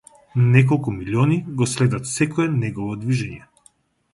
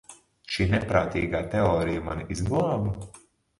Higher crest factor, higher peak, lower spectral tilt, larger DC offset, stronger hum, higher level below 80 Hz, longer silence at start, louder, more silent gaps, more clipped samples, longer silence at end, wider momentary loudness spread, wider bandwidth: about the same, 20 dB vs 22 dB; first, 0 dBFS vs -6 dBFS; about the same, -6.5 dB/octave vs -6.5 dB/octave; neither; neither; second, -50 dBFS vs -42 dBFS; first, 0.35 s vs 0.1 s; first, -20 LUFS vs -26 LUFS; neither; neither; first, 0.75 s vs 0.4 s; about the same, 11 LU vs 9 LU; about the same, 11.5 kHz vs 11.5 kHz